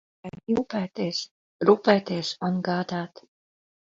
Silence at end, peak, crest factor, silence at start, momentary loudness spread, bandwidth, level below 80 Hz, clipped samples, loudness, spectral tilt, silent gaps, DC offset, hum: 0.9 s; -4 dBFS; 22 dB; 0.25 s; 19 LU; 7.8 kHz; -64 dBFS; under 0.1%; -25 LUFS; -6 dB/octave; 1.31-1.59 s; under 0.1%; none